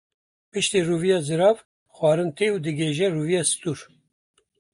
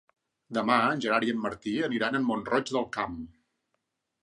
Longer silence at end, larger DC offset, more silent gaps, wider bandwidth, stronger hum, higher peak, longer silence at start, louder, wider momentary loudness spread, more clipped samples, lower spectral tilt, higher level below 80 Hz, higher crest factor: about the same, 0.95 s vs 0.95 s; neither; first, 1.65-1.86 s vs none; about the same, 11.5 kHz vs 10.5 kHz; neither; about the same, -6 dBFS vs -8 dBFS; about the same, 0.55 s vs 0.5 s; first, -23 LUFS vs -28 LUFS; about the same, 8 LU vs 10 LU; neither; about the same, -4.5 dB/octave vs -5 dB/octave; about the same, -64 dBFS vs -62 dBFS; about the same, 18 dB vs 22 dB